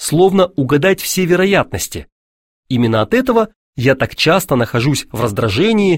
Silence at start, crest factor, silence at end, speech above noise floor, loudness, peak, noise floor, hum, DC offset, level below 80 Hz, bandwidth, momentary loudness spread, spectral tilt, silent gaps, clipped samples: 0 s; 14 dB; 0 s; over 76 dB; -14 LUFS; 0 dBFS; under -90 dBFS; none; under 0.1%; -42 dBFS; 16.5 kHz; 8 LU; -5 dB/octave; 2.12-2.63 s, 3.56-3.73 s; under 0.1%